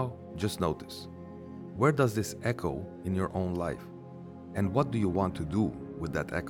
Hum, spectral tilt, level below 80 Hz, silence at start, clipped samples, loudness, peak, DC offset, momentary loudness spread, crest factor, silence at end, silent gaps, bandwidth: none; -6.5 dB/octave; -56 dBFS; 0 s; under 0.1%; -31 LUFS; -12 dBFS; under 0.1%; 16 LU; 20 dB; 0 s; none; 18 kHz